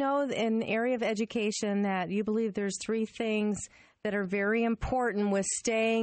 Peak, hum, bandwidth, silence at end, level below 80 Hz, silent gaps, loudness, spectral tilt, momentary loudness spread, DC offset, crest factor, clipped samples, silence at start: -18 dBFS; none; 8.8 kHz; 0 s; -54 dBFS; none; -30 LUFS; -4.5 dB/octave; 5 LU; under 0.1%; 12 dB; under 0.1%; 0 s